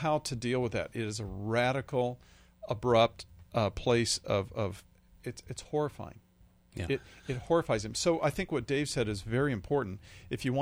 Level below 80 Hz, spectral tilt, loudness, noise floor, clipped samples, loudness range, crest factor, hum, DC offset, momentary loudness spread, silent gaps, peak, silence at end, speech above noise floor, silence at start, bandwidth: -54 dBFS; -5 dB/octave; -32 LUFS; -62 dBFS; under 0.1%; 5 LU; 20 dB; none; under 0.1%; 16 LU; none; -12 dBFS; 0 s; 31 dB; 0 s; over 20 kHz